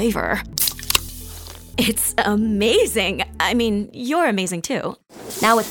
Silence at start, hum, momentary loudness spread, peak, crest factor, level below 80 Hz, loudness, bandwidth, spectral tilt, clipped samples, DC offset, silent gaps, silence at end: 0 s; none; 15 LU; 0 dBFS; 20 dB; -40 dBFS; -20 LUFS; over 20 kHz; -3 dB/octave; under 0.1%; under 0.1%; none; 0 s